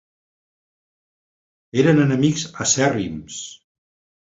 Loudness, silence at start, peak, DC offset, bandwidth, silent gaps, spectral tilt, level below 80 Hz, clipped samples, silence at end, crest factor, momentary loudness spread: -19 LUFS; 1.75 s; -2 dBFS; under 0.1%; 8 kHz; none; -4.5 dB/octave; -54 dBFS; under 0.1%; 0.8 s; 20 dB; 17 LU